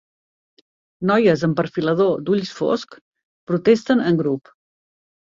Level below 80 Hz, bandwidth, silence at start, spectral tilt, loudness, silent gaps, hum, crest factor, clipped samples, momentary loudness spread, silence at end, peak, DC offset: -62 dBFS; 7.6 kHz; 1 s; -7 dB/octave; -19 LUFS; 3.01-3.12 s, 3.25-3.47 s; none; 18 dB; under 0.1%; 9 LU; 0.85 s; -2 dBFS; under 0.1%